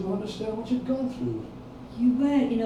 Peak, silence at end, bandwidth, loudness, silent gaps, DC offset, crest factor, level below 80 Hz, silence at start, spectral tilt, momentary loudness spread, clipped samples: -12 dBFS; 0 s; 9.8 kHz; -27 LUFS; none; under 0.1%; 14 dB; -52 dBFS; 0 s; -7.5 dB/octave; 17 LU; under 0.1%